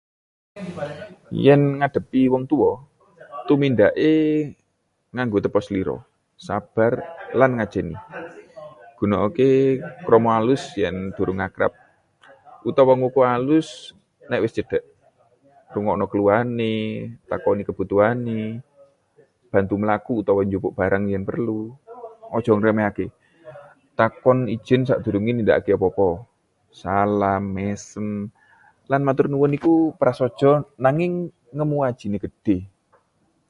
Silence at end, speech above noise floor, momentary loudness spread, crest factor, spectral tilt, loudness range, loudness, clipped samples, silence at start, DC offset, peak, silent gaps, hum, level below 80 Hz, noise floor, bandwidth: 0.8 s; 50 dB; 15 LU; 20 dB; -8 dB/octave; 4 LU; -21 LUFS; under 0.1%; 0.55 s; under 0.1%; 0 dBFS; none; none; -50 dBFS; -70 dBFS; 10.5 kHz